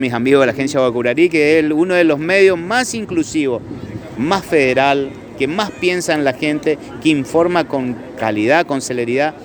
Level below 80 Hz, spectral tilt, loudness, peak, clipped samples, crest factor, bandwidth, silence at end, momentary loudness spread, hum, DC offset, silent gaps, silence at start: -50 dBFS; -5 dB/octave; -15 LUFS; 0 dBFS; under 0.1%; 16 dB; over 20 kHz; 0 s; 9 LU; none; under 0.1%; none; 0 s